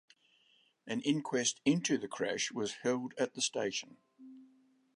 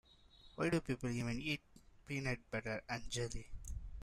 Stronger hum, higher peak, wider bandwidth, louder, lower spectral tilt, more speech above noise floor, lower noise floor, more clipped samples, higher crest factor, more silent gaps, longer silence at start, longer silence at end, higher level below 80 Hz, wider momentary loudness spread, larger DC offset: neither; first, -16 dBFS vs -24 dBFS; second, 11 kHz vs 14.5 kHz; first, -34 LUFS vs -42 LUFS; second, -3.5 dB/octave vs -5 dB/octave; first, 36 dB vs 23 dB; first, -71 dBFS vs -64 dBFS; neither; about the same, 20 dB vs 18 dB; neither; first, 0.85 s vs 0.35 s; first, 0.5 s vs 0 s; second, -80 dBFS vs -54 dBFS; second, 10 LU vs 13 LU; neither